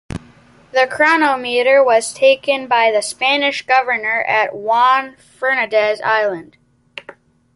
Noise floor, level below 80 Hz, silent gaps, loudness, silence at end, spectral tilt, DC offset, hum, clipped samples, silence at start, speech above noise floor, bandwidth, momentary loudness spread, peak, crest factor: -47 dBFS; -52 dBFS; none; -15 LUFS; 0.45 s; -2.5 dB/octave; under 0.1%; none; under 0.1%; 0.1 s; 32 dB; 11.5 kHz; 19 LU; -2 dBFS; 14 dB